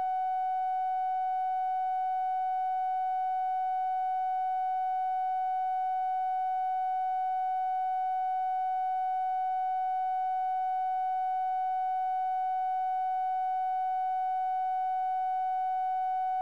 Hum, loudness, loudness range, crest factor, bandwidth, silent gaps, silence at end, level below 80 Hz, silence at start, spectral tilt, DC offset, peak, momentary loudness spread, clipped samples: none; -31 LUFS; 0 LU; 4 dB; 4.7 kHz; none; 0 s; under -90 dBFS; 0 s; -1 dB/octave; 0.2%; -26 dBFS; 0 LU; under 0.1%